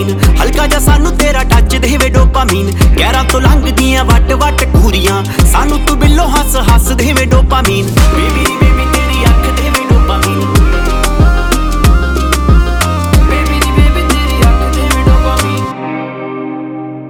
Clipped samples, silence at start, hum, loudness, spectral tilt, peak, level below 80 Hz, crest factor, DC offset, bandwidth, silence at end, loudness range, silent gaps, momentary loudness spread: 0.2%; 0 s; none; -10 LUFS; -5 dB/octave; 0 dBFS; -10 dBFS; 8 dB; under 0.1%; 18.5 kHz; 0 s; 1 LU; none; 3 LU